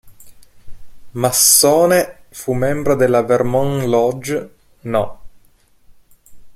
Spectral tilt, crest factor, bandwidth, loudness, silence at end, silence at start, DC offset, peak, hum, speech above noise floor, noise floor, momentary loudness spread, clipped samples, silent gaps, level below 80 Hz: -3.5 dB/octave; 18 dB; 16.5 kHz; -15 LUFS; 0.05 s; 0.05 s; under 0.1%; 0 dBFS; none; 37 dB; -51 dBFS; 17 LU; under 0.1%; none; -44 dBFS